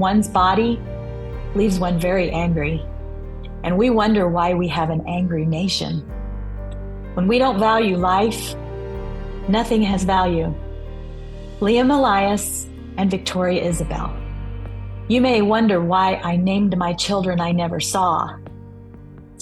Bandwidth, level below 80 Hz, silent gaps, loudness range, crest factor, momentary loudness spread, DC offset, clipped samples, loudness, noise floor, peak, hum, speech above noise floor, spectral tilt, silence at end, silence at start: 12.5 kHz; -34 dBFS; none; 3 LU; 14 dB; 16 LU; under 0.1%; under 0.1%; -19 LUFS; -40 dBFS; -4 dBFS; none; 22 dB; -5.5 dB/octave; 0 s; 0 s